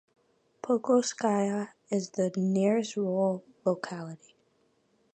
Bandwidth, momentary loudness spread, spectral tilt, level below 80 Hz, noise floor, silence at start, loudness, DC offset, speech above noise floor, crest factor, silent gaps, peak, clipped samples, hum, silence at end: 9 kHz; 13 LU; -6 dB/octave; -80 dBFS; -70 dBFS; 0.65 s; -29 LUFS; under 0.1%; 42 dB; 18 dB; none; -12 dBFS; under 0.1%; none; 1 s